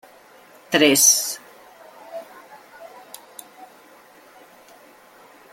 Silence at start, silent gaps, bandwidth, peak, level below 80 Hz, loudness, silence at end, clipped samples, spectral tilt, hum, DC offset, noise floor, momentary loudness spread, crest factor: 0.7 s; none; 17 kHz; -2 dBFS; -70 dBFS; -15 LUFS; 1.9 s; under 0.1%; -1 dB/octave; none; under 0.1%; -49 dBFS; 29 LU; 24 dB